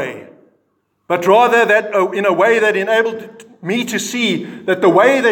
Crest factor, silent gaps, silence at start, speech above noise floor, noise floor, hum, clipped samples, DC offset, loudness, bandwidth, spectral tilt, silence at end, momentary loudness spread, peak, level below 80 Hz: 14 dB; none; 0 s; 51 dB; -65 dBFS; none; under 0.1%; under 0.1%; -14 LUFS; 18 kHz; -4 dB/octave; 0 s; 11 LU; 0 dBFS; -70 dBFS